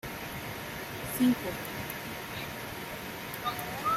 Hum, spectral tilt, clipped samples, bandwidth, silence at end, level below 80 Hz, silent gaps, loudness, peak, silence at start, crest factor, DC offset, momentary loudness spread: none; -4 dB/octave; under 0.1%; 16 kHz; 0 s; -56 dBFS; none; -34 LUFS; -16 dBFS; 0.05 s; 18 dB; under 0.1%; 11 LU